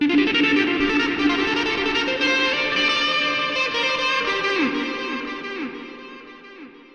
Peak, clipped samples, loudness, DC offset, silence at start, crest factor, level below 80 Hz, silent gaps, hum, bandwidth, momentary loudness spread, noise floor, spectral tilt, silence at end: -6 dBFS; under 0.1%; -20 LUFS; under 0.1%; 0 s; 16 dB; -52 dBFS; none; none; 9 kHz; 14 LU; -42 dBFS; -3 dB/octave; 0.15 s